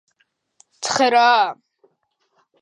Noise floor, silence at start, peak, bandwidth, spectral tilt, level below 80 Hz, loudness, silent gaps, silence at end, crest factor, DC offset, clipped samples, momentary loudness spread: -69 dBFS; 0.8 s; -4 dBFS; 11 kHz; -1.5 dB/octave; -74 dBFS; -17 LUFS; none; 1.1 s; 18 dB; under 0.1%; under 0.1%; 10 LU